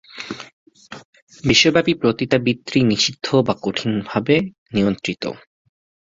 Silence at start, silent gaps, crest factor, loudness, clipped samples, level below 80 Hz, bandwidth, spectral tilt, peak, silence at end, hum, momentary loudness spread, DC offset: 0.15 s; 0.53-0.66 s, 1.05-1.13 s, 1.22-1.27 s, 4.58-4.66 s; 18 dB; -18 LUFS; under 0.1%; -52 dBFS; 7.8 kHz; -4.5 dB/octave; -2 dBFS; 0.75 s; none; 20 LU; under 0.1%